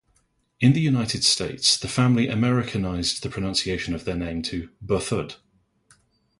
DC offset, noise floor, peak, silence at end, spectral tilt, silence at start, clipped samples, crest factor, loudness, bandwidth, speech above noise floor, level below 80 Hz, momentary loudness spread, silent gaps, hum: under 0.1%; -67 dBFS; -6 dBFS; 1.05 s; -4.5 dB/octave; 0.6 s; under 0.1%; 18 dB; -23 LUFS; 11.5 kHz; 44 dB; -46 dBFS; 9 LU; none; none